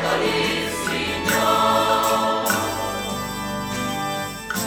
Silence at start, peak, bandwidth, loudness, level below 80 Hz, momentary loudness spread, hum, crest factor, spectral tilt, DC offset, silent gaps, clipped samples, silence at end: 0 s; -4 dBFS; over 20 kHz; -21 LUFS; -46 dBFS; 9 LU; none; 18 dB; -3 dB/octave; under 0.1%; none; under 0.1%; 0 s